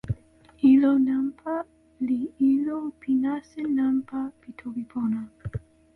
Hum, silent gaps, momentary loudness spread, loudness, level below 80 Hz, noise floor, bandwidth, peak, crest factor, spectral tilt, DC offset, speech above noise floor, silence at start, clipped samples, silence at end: none; none; 17 LU; -25 LUFS; -52 dBFS; -53 dBFS; 4.2 kHz; -10 dBFS; 16 dB; -9 dB/octave; under 0.1%; 28 dB; 0.05 s; under 0.1%; 0.35 s